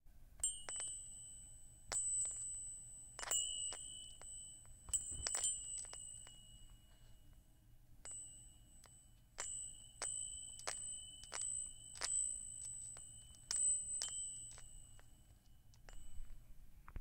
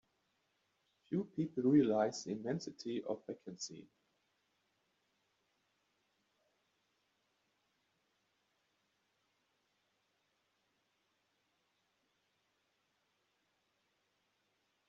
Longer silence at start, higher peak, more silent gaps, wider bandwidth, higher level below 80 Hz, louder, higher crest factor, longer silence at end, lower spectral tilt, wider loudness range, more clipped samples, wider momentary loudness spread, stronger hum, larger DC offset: second, 0.05 s vs 1.1 s; about the same, -18 dBFS vs -20 dBFS; neither; first, 16.5 kHz vs 7.4 kHz; first, -62 dBFS vs -84 dBFS; second, -43 LUFS vs -38 LUFS; about the same, 28 dB vs 24 dB; second, 0 s vs 11.05 s; second, 0.5 dB/octave vs -6.5 dB/octave; second, 11 LU vs 17 LU; neither; first, 22 LU vs 16 LU; second, none vs 50 Hz at -85 dBFS; neither